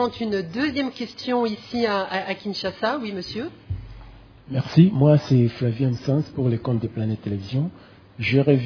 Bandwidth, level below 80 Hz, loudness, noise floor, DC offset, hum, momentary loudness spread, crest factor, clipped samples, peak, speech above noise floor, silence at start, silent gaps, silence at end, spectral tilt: 5.4 kHz; -50 dBFS; -23 LUFS; -44 dBFS; under 0.1%; none; 13 LU; 20 dB; under 0.1%; -2 dBFS; 23 dB; 0 s; none; 0 s; -8 dB/octave